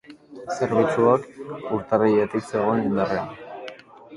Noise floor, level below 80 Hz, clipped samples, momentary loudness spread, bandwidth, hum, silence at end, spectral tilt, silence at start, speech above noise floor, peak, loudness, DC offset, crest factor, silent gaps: -42 dBFS; -58 dBFS; under 0.1%; 18 LU; 11.5 kHz; none; 0 s; -7 dB/octave; 0.1 s; 20 dB; -4 dBFS; -22 LUFS; under 0.1%; 20 dB; none